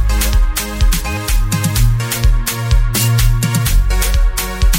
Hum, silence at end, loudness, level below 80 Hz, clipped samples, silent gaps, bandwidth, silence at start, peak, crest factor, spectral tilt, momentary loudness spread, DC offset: none; 0 s; -16 LUFS; -14 dBFS; under 0.1%; none; 17 kHz; 0 s; 0 dBFS; 12 dB; -4 dB/octave; 4 LU; under 0.1%